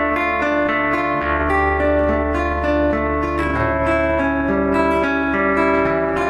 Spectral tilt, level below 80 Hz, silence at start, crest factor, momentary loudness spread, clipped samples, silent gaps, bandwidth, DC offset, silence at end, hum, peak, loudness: -7.5 dB/octave; -30 dBFS; 0 s; 12 dB; 3 LU; under 0.1%; none; 11.5 kHz; under 0.1%; 0 s; none; -6 dBFS; -18 LUFS